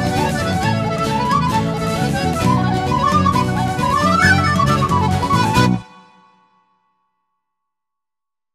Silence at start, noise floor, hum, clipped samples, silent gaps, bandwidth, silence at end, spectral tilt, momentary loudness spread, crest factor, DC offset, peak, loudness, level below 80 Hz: 0 s; -89 dBFS; none; under 0.1%; none; 14 kHz; 2.7 s; -5.5 dB/octave; 6 LU; 16 dB; under 0.1%; 0 dBFS; -16 LUFS; -36 dBFS